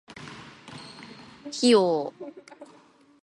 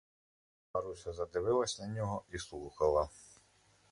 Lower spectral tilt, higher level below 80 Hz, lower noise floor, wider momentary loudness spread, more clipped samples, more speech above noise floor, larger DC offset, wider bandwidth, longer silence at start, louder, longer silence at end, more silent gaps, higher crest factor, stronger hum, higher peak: about the same, -4 dB/octave vs -5 dB/octave; second, -72 dBFS vs -58 dBFS; second, -57 dBFS vs -68 dBFS; first, 24 LU vs 12 LU; neither; about the same, 33 dB vs 33 dB; neither; about the same, 11.5 kHz vs 11.5 kHz; second, 0.1 s vs 0.75 s; first, -23 LUFS vs -37 LUFS; about the same, 0.6 s vs 0.65 s; neither; about the same, 20 dB vs 20 dB; neither; first, -8 dBFS vs -18 dBFS